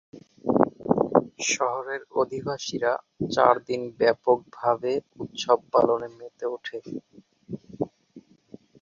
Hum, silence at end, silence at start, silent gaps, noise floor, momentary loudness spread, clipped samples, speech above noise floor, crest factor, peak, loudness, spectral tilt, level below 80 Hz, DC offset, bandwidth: none; 0.6 s; 0.15 s; none; -52 dBFS; 15 LU; under 0.1%; 26 dB; 24 dB; -2 dBFS; -25 LUFS; -4.5 dB/octave; -64 dBFS; under 0.1%; 7.6 kHz